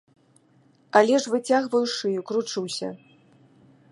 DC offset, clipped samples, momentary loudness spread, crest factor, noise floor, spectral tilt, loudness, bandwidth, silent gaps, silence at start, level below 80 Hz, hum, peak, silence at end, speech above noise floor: under 0.1%; under 0.1%; 11 LU; 22 dB; -60 dBFS; -3.5 dB/octave; -23 LUFS; 11.5 kHz; none; 0.95 s; -80 dBFS; none; -2 dBFS; 0.95 s; 37 dB